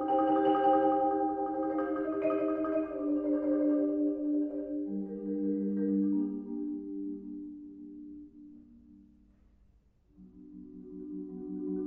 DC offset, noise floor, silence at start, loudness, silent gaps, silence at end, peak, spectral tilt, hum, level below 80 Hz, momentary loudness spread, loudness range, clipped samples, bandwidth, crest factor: under 0.1%; -65 dBFS; 0 s; -31 LUFS; none; 0 s; -16 dBFS; -10.5 dB/octave; none; -66 dBFS; 20 LU; 20 LU; under 0.1%; 3.2 kHz; 16 dB